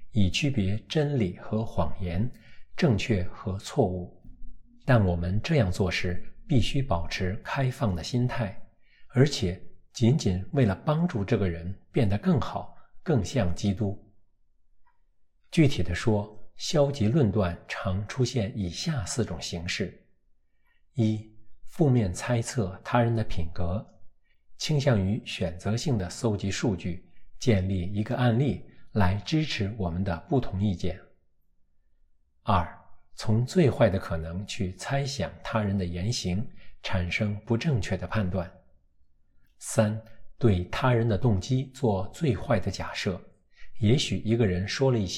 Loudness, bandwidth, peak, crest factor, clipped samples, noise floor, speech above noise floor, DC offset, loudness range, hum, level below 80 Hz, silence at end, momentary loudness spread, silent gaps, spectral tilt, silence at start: -28 LUFS; 13 kHz; -8 dBFS; 20 dB; under 0.1%; -63 dBFS; 37 dB; under 0.1%; 4 LU; none; -44 dBFS; 0 s; 10 LU; none; -6 dB/octave; 0 s